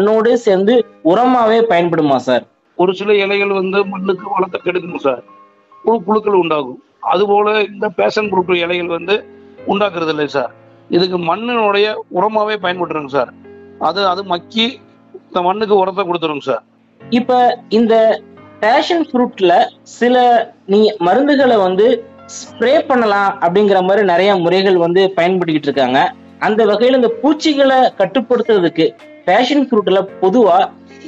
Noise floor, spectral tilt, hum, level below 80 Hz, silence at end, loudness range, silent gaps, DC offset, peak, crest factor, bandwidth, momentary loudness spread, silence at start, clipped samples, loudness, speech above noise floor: -43 dBFS; -5.5 dB/octave; none; -62 dBFS; 0 s; 4 LU; none; under 0.1%; -2 dBFS; 12 dB; 8 kHz; 8 LU; 0 s; under 0.1%; -14 LUFS; 30 dB